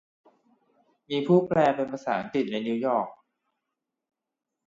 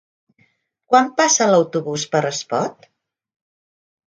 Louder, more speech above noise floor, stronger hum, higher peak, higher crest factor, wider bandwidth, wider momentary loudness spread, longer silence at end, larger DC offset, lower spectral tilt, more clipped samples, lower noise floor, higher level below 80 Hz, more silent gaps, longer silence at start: second, -26 LUFS vs -18 LUFS; first, 59 dB vs 44 dB; neither; second, -8 dBFS vs -2 dBFS; about the same, 20 dB vs 20 dB; second, 7.6 kHz vs 10 kHz; about the same, 8 LU vs 9 LU; about the same, 1.55 s vs 1.45 s; neither; first, -7.5 dB/octave vs -3 dB/octave; neither; first, -84 dBFS vs -62 dBFS; about the same, -68 dBFS vs -70 dBFS; neither; first, 1.1 s vs 0.9 s